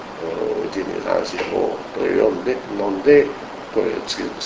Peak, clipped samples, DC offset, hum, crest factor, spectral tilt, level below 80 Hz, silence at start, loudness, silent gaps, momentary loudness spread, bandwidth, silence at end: -2 dBFS; under 0.1%; 0.1%; none; 18 dB; -5 dB/octave; -52 dBFS; 0 s; -20 LUFS; none; 11 LU; 8 kHz; 0 s